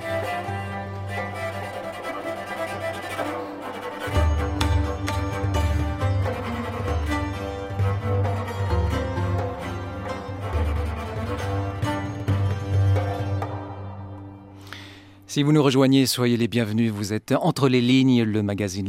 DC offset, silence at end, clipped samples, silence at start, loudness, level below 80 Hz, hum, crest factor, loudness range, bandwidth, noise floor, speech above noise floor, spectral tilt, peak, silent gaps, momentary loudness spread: under 0.1%; 0 s; under 0.1%; 0 s; -25 LUFS; -34 dBFS; none; 18 dB; 7 LU; 16 kHz; -44 dBFS; 24 dB; -6 dB/octave; -4 dBFS; none; 13 LU